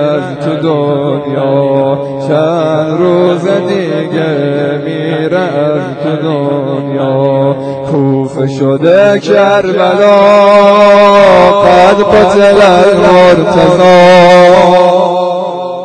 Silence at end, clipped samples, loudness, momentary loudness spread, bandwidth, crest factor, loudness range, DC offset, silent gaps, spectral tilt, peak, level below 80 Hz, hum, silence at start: 0 s; 5%; -7 LUFS; 10 LU; 11 kHz; 6 dB; 8 LU; under 0.1%; none; -6.5 dB/octave; 0 dBFS; -40 dBFS; none; 0 s